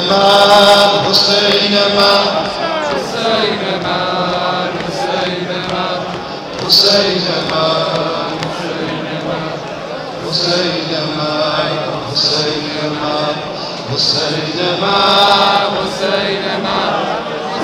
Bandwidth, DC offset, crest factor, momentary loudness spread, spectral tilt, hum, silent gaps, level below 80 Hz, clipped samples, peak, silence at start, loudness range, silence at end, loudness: 17.5 kHz; under 0.1%; 14 dB; 12 LU; -3.5 dB/octave; none; none; -48 dBFS; under 0.1%; 0 dBFS; 0 s; 6 LU; 0 s; -13 LUFS